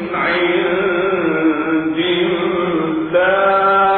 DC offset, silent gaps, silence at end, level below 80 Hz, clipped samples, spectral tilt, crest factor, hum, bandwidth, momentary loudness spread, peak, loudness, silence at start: under 0.1%; none; 0 s; -50 dBFS; under 0.1%; -9 dB/octave; 12 dB; none; 4.3 kHz; 5 LU; -4 dBFS; -15 LUFS; 0 s